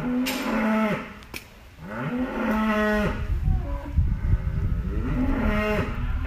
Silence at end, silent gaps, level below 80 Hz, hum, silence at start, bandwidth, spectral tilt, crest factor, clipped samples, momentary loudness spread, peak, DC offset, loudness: 0 s; none; -30 dBFS; none; 0 s; 15.5 kHz; -6.5 dB/octave; 16 dB; under 0.1%; 11 LU; -10 dBFS; under 0.1%; -26 LUFS